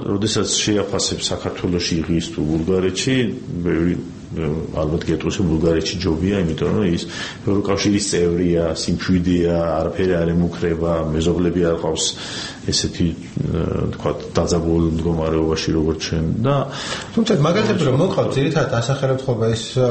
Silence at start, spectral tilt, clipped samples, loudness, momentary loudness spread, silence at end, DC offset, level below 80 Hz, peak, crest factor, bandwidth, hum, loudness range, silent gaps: 0 s; -5.5 dB/octave; under 0.1%; -19 LUFS; 6 LU; 0 s; under 0.1%; -36 dBFS; -2 dBFS; 16 dB; 8.8 kHz; none; 2 LU; none